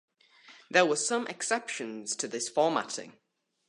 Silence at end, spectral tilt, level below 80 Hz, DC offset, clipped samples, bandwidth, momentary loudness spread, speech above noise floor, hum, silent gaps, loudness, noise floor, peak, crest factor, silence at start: 0.55 s; -2 dB/octave; -84 dBFS; under 0.1%; under 0.1%; 11.5 kHz; 11 LU; 27 dB; none; none; -30 LUFS; -57 dBFS; -8 dBFS; 24 dB; 0.5 s